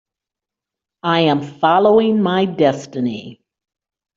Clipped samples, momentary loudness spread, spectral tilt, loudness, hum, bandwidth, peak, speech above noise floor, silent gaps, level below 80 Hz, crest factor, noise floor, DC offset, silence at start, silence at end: under 0.1%; 11 LU; -6.5 dB/octave; -16 LUFS; none; 7.6 kHz; -2 dBFS; 71 dB; none; -60 dBFS; 16 dB; -86 dBFS; under 0.1%; 1.05 s; 0.85 s